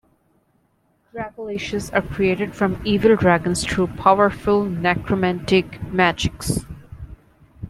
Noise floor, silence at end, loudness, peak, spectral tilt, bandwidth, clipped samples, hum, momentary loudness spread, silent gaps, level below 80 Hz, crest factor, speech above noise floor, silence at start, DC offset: -64 dBFS; 0 s; -20 LUFS; 0 dBFS; -5.5 dB/octave; 14.5 kHz; under 0.1%; none; 16 LU; none; -42 dBFS; 20 dB; 44 dB; 1.15 s; under 0.1%